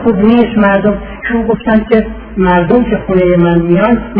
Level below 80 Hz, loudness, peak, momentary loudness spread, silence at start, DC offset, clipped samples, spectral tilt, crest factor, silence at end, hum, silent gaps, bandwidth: -28 dBFS; -10 LUFS; 0 dBFS; 6 LU; 0 s; under 0.1%; 0.5%; -11 dB/octave; 10 dB; 0 s; none; none; 4.7 kHz